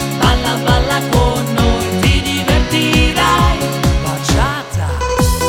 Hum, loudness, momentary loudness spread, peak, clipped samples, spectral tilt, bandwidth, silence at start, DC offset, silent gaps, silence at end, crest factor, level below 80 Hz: none; -14 LUFS; 5 LU; 0 dBFS; under 0.1%; -4.5 dB/octave; 18.5 kHz; 0 s; under 0.1%; none; 0 s; 14 dB; -20 dBFS